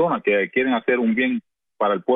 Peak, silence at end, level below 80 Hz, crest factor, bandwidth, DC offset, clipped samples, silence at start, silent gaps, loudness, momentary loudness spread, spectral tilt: -8 dBFS; 0 s; -64 dBFS; 14 dB; 3.9 kHz; under 0.1%; under 0.1%; 0 s; none; -21 LUFS; 5 LU; -9 dB/octave